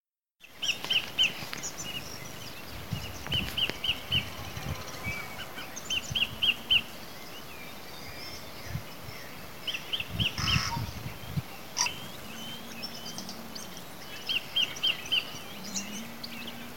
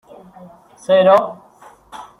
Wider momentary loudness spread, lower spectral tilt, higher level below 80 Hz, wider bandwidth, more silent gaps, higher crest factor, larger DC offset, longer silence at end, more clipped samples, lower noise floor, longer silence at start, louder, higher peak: second, 16 LU vs 26 LU; second, -2 dB/octave vs -5.5 dB/octave; first, -52 dBFS vs -62 dBFS; first, 17.5 kHz vs 11 kHz; first, 0.00-0.04 s vs none; first, 24 dB vs 18 dB; first, 0.6% vs under 0.1%; second, 0 s vs 0.2 s; neither; first, -58 dBFS vs -46 dBFS; second, 0 s vs 0.9 s; second, -31 LUFS vs -13 LUFS; second, -10 dBFS vs -2 dBFS